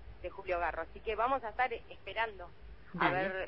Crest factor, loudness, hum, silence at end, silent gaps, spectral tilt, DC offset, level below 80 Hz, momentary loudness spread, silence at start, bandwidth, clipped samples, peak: 20 dB; -35 LUFS; none; 0 s; none; -2.5 dB/octave; 0.2%; -54 dBFS; 15 LU; 0 s; 5.8 kHz; under 0.1%; -16 dBFS